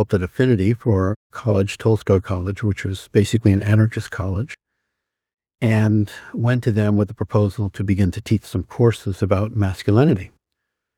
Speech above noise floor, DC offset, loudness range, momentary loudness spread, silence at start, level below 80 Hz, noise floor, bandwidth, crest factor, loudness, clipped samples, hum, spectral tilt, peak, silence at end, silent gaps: 61 dB; under 0.1%; 2 LU; 9 LU; 0 s; -46 dBFS; -80 dBFS; 12.5 kHz; 18 dB; -20 LUFS; under 0.1%; none; -8 dB/octave; -2 dBFS; 0.7 s; 1.16-1.30 s